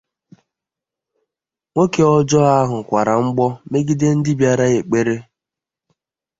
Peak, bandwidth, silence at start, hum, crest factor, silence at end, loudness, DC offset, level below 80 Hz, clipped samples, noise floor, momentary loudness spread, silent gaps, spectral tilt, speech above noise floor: -2 dBFS; 7.8 kHz; 1.75 s; none; 16 dB; 1.15 s; -16 LUFS; under 0.1%; -52 dBFS; under 0.1%; -87 dBFS; 7 LU; none; -6.5 dB/octave; 71 dB